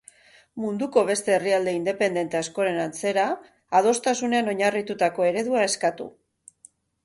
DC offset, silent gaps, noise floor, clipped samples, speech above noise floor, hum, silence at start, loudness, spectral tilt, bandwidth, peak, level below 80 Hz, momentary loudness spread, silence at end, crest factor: under 0.1%; none; -56 dBFS; under 0.1%; 33 dB; none; 0.55 s; -24 LUFS; -3.5 dB/octave; 11.5 kHz; -6 dBFS; -68 dBFS; 7 LU; 0.95 s; 18 dB